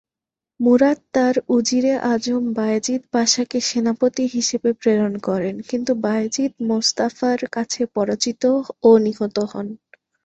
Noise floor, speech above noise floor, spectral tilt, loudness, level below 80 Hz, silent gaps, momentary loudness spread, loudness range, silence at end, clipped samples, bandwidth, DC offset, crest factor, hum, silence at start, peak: -88 dBFS; 69 dB; -4 dB/octave; -19 LUFS; -62 dBFS; none; 8 LU; 2 LU; 0.5 s; under 0.1%; 8.2 kHz; under 0.1%; 18 dB; none; 0.6 s; -2 dBFS